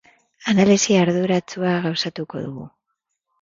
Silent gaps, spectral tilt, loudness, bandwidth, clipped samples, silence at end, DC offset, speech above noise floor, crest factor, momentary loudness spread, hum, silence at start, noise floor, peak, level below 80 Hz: none; -5 dB/octave; -19 LUFS; 7.8 kHz; under 0.1%; 0.75 s; under 0.1%; 58 dB; 18 dB; 15 LU; none; 0.4 s; -77 dBFS; -2 dBFS; -60 dBFS